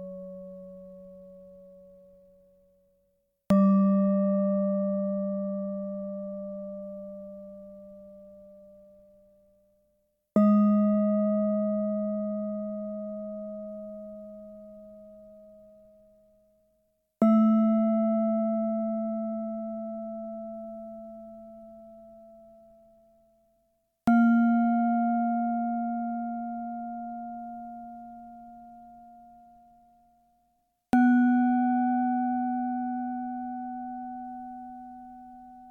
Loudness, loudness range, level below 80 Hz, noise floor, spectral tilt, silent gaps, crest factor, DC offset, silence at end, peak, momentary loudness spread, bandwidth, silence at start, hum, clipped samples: -27 LUFS; 18 LU; -66 dBFS; -73 dBFS; -10 dB/octave; none; 18 dB; under 0.1%; 0 s; -10 dBFS; 25 LU; 3.5 kHz; 0 s; none; under 0.1%